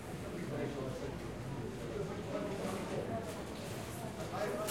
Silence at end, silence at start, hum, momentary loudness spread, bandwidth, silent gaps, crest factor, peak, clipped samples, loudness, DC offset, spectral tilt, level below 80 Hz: 0 s; 0 s; none; 4 LU; 16.5 kHz; none; 16 dB; -24 dBFS; under 0.1%; -41 LUFS; under 0.1%; -5.5 dB/octave; -58 dBFS